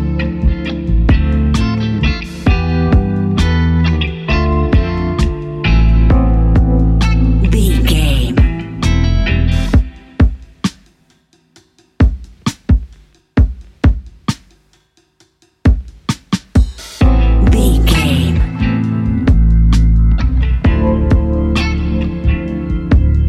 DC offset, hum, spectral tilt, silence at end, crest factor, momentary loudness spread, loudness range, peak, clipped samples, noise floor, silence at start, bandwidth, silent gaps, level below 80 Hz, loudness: under 0.1%; none; -7 dB/octave; 0 s; 12 dB; 8 LU; 6 LU; 0 dBFS; under 0.1%; -55 dBFS; 0 s; 13 kHz; none; -14 dBFS; -14 LUFS